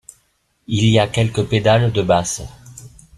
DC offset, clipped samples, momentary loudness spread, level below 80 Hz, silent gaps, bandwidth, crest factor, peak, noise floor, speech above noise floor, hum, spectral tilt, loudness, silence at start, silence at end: under 0.1%; under 0.1%; 10 LU; -44 dBFS; none; 12.5 kHz; 16 dB; -2 dBFS; -63 dBFS; 48 dB; none; -5.5 dB/octave; -17 LUFS; 0.7 s; 0.3 s